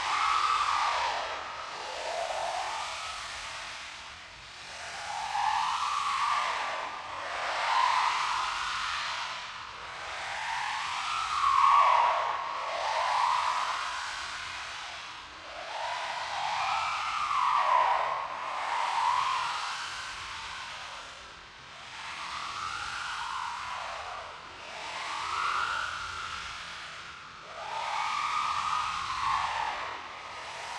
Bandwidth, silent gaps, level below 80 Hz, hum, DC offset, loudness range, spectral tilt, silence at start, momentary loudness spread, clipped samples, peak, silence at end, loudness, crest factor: 12.5 kHz; none; -62 dBFS; none; under 0.1%; 9 LU; -0.5 dB/octave; 0 s; 15 LU; under 0.1%; -12 dBFS; 0 s; -31 LUFS; 20 dB